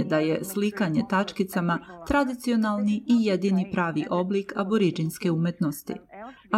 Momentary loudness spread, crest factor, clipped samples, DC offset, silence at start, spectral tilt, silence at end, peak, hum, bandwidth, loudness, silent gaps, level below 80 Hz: 6 LU; 14 dB; under 0.1%; under 0.1%; 0 s; -6.5 dB/octave; 0 s; -10 dBFS; none; 16 kHz; -26 LUFS; none; -54 dBFS